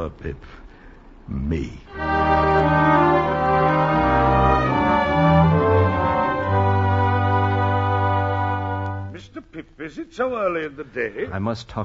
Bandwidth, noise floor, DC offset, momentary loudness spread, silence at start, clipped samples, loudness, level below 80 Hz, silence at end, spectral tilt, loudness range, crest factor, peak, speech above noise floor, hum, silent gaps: 7.2 kHz; -44 dBFS; under 0.1%; 17 LU; 0 s; under 0.1%; -20 LUFS; -36 dBFS; 0 s; -8.5 dB/octave; 8 LU; 16 dB; -4 dBFS; 17 dB; none; none